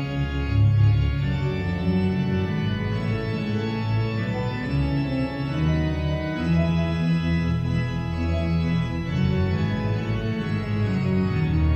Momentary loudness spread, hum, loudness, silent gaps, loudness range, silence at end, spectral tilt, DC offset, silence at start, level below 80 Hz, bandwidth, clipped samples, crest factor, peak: 5 LU; none; -24 LUFS; none; 2 LU; 0 s; -8.5 dB/octave; under 0.1%; 0 s; -36 dBFS; 7.2 kHz; under 0.1%; 14 dB; -10 dBFS